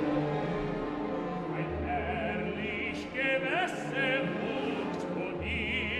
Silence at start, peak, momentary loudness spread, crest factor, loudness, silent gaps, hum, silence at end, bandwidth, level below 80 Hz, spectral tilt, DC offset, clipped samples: 0 s; -16 dBFS; 5 LU; 16 dB; -32 LUFS; none; none; 0 s; 12 kHz; -50 dBFS; -6 dB/octave; under 0.1%; under 0.1%